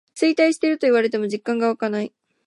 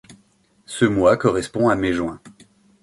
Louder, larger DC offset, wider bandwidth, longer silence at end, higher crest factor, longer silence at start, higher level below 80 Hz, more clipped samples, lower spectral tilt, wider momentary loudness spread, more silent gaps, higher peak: about the same, -20 LUFS vs -19 LUFS; neither; about the same, 11.5 kHz vs 11.5 kHz; second, 0.4 s vs 0.55 s; about the same, 14 dB vs 18 dB; about the same, 0.15 s vs 0.1 s; second, -76 dBFS vs -48 dBFS; neither; second, -4.5 dB/octave vs -6 dB/octave; second, 7 LU vs 14 LU; neither; about the same, -6 dBFS vs -4 dBFS